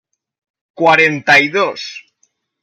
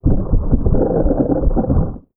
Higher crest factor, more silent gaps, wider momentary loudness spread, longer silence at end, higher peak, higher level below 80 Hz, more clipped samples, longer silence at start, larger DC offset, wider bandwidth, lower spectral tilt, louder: about the same, 16 dB vs 14 dB; neither; first, 15 LU vs 2 LU; first, 0.6 s vs 0 s; about the same, 0 dBFS vs 0 dBFS; second, -64 dBFS vs -18 dBFS; neither; first, 0.8 s vs 0 s; neither; first, 15 kHz vs 1.8 kHz; second, -4 dB/octave vs -16.5 dB/octave; first, -11 LUFS vs -17 LUFS